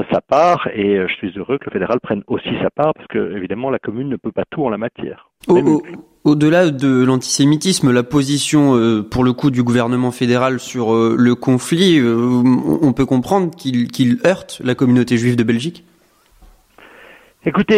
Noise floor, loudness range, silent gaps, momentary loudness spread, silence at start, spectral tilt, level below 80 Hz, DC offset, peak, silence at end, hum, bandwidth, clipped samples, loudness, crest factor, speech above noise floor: -53 dBFS; 6 LU; none; 9 LU; 0 s; -5.5 dB/octave; -48 dBFS; under 0.1%; -2 dBFS; 0 s; none; 14.5 kHz; under 0.1%; -16 LUFS; 14 dB; 38 dB